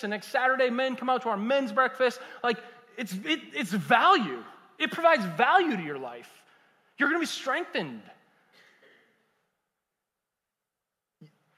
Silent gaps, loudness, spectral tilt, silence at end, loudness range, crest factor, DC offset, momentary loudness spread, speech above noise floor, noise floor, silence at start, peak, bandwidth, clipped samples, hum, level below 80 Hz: none; -26 LUFS; -4.5 dB/octave; 0.3 s; 8 LU; 22 dB; under 0.1%; 15 LU; 60 dB; -87 dBFS; 0 s; -8 dBFS; 16 kHz; under 0.1%; none; -82 dBFS